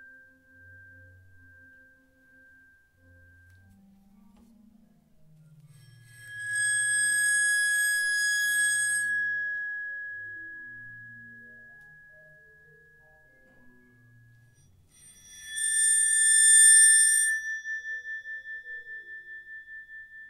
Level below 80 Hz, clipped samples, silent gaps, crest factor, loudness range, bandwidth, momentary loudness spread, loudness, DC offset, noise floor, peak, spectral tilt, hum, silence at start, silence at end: -70 dBFS; under 0.1%; none; 20 dB; 18 LU; 16 kHz; 27 LU; -21 LUFS; under 0.1%; -60 dBFS; -8 dBFS; 3 dB/octave; none; 6.2 s; 0 s